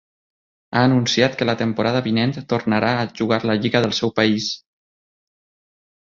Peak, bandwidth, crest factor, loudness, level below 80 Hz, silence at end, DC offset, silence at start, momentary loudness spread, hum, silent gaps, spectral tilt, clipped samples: -2 dBFS; 7.6 kHz; 18 dB; -19 LUFS; -56 dBFS; 1.45 s; under 0.1%; 0.7 s; 6 LU; none; none; -5.5 dB/octave; under 0.1%